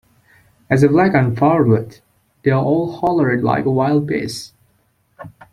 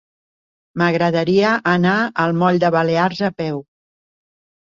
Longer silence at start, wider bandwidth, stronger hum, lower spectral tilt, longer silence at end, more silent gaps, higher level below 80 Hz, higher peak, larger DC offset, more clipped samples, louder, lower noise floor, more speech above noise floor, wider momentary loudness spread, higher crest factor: about the same, 0.7 s vs 0.75 s; first, 13.5 kHz vs 7.4 kHz; neither; about the same, -7.5 dB/octave vs -7 dB/octave; second, 0.25 s vs 1.05 s; neither; first, -50 dBFS vs -58 dBFS; about the same, -2 dBFS vs -2 dBFS; neither; neither; about the same, -16 LUFS vs -17 LUFS; second, -61 dBFS vs under -90 dBFS; second, 45 dB vs over 73 dB; about the same, 10 LU vs 9 LU; about the same, 16 dB vs 16 dB